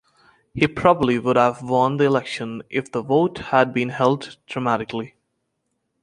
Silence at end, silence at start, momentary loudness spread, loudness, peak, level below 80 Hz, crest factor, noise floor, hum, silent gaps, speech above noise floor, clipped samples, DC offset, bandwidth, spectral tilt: 0.95 s; 0.55 s; 12 LU; -20 LUFS; 0 dBFS; -54 dBFS; 20 dB; -74 dBFS; none; none; 54 dB; under 0.1%; under 0.1%; 10.5 kHz; -6.5 dB/octave